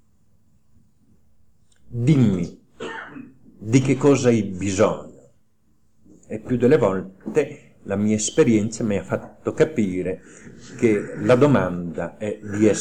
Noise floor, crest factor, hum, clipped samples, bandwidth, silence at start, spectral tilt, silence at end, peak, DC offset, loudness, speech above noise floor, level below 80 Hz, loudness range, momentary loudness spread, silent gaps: -65 dBFS; 18 dB; none; under 0.1%; 10.5 kHz; 1.9 s; -6.5 dB/octave; 0 s; -4 dBFS; 0.4%; -21 LUFS; 45 dB; -54 dBFS; 3 LU; 18 LU; none